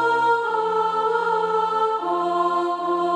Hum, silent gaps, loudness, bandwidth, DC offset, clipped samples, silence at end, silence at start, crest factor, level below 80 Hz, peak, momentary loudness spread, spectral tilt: none; none; -21 LUFS; 10.5 kHz; under 0.1%; under 0.1%; 0 s; 0 s; 12 dB; -72 dBFS; -8 dBFS; 3 LU; -5 dB/octave